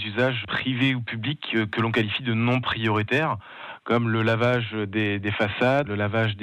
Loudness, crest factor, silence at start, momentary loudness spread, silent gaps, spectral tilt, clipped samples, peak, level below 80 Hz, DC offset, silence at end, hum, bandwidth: -24 LUFS; 14 dB; 0 s; 5 LU; none; -7 dB/octave; under 0.1%; -10 dBFS; -62 dBFS; under 0.1%; 0 s; none; 8.4 kHz